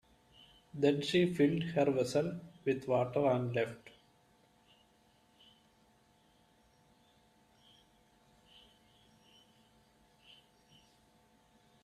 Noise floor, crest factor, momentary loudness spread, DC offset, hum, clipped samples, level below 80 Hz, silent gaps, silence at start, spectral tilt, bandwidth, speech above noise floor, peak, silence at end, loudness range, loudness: -69 dBFS; 22 dB; 10 LU; under 0.1%; none; under 0.1%; -72 dBFS; none; 0.75 s; -6.5 dB/octave; 13.5 kHz; 37 dB; -16 dBFS; 7.95 s; 9 LU; -33 LUFS